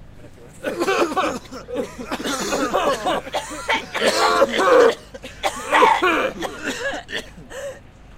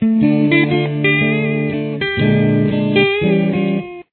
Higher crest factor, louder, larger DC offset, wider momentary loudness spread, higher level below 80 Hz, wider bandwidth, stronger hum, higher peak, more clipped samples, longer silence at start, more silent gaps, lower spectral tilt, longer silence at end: first, 20 dB vs 14 dB; second, -20 LUFS vs -15 LUFS; neither; first, 17 LU vs 6 LU; about the same, -48 dBFS vs -48 dBFS; first, 16 kHz vs 4.4 kHz; neither; about the same, -2 dBFS vs 0 dBFS; neither; about the same, 0 s vs 0 s; neither; second, -2.5 dB/octave vs -10.5 dB/octave; about the same, 0 s vs 0.1 s